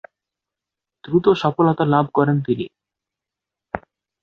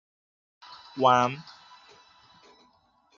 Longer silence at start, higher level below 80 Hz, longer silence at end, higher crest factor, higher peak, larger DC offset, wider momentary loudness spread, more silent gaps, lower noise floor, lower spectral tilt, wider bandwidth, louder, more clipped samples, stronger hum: first, 1.05 s vs 0.7 s; first, -56 dBFS vs -72 dBFS; second, 0.45 s vs 1.75 s; about the same, 20 dB vs 24 dB; first, -2 dBFS vs -8 dBFS; neither; second, 16 LU vs 27 LU; neither; first, -86 dBFS vs -65 dBFS; first, -8.5 dB/octave vs -3 dB/octave; about the same, 6.8 kHz vs 7.2 kHz; first, -18 LUFS vs -23 LUFS; neither; neither